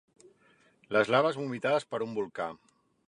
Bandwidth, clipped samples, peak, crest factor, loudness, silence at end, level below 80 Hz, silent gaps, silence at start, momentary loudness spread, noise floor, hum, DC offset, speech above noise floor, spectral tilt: 11 kHz; under 0.1%; -12 dBFS; 20 dB; -30 LUFS; 0.55 s; -76 dBFS; none; 0.9 s; 11 LU; -65 dBFS; none; under 0.1%; 36 dB; -5.5 dB/octave